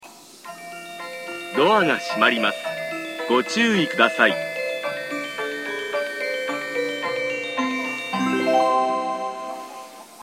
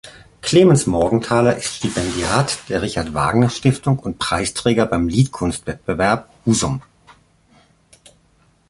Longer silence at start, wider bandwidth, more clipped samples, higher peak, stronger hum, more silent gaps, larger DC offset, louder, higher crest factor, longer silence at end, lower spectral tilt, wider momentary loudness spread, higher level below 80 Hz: about the same, 0 s vs 0.05 s; first, 16 kHz vs 11.5 kHz; neither; about the same, -2 dBFS vs -2 dBFS; neither; neither; neither; second, -22 LUFS vs -18 LUFS; about the same, 22 dB vs 18 dB; second, 0 s vs 1.9 s; second, -3.5 dB/octave vs -5.5 dB/octave; first, 16 LU vs 9 LU; second, -70 dBFS vs -40 dBFS